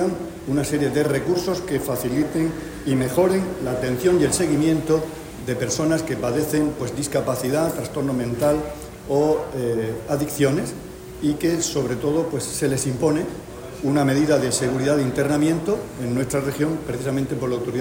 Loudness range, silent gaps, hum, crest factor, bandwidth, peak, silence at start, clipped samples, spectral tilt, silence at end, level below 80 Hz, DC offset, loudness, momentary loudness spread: 2 LU; none; none; 16 dB; 16.5 kHz; -6 dBFS; 0 s; under 0.1%; -5.5 dB/octave; 0 s; -46 dBFS; under 0.1%; -22 LUFS; 7 LU